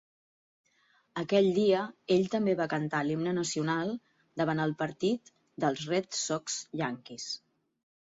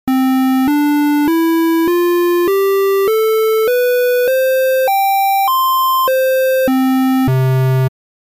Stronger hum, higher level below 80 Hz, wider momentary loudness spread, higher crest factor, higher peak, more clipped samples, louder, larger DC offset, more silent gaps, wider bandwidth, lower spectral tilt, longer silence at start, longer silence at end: neither; second, -72 dBFS vs -50 dBFS; first, 12 LU vs 1 LU; first, 18 dB vs 6 dB; second, -14 dBFS vs -6 dBFS; neither; second, -31 LUFS vs -13 LUFS; neither; neither; second, 8 kHz vs 15.5 kHz; second, -4.5 dB/octave vs -6 dB/octave; first, 1.15 s vs 0.05 s; first, 0.8 s vs 0.3 s